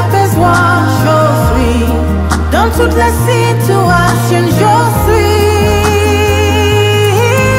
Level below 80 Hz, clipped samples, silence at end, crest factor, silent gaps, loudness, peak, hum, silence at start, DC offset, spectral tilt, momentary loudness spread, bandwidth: -20 dBFS; under 0.1%; 0 s; 8 dB; none; -9 LUFS; 0 dBFS; none; 0 s; under 0.1%; -5.5 dB/octave; 2 LU; 16.5 kHz